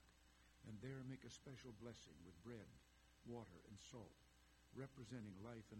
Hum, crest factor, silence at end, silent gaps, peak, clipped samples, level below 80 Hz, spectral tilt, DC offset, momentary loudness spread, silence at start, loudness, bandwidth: none; 18 dB; 0 s; none; -40 dBFS; under 0.1%; -76 dBFS; -5.5 dB/octave; under 0.1%; 8 LU; 0 s; -59 LUFS; 16 kHz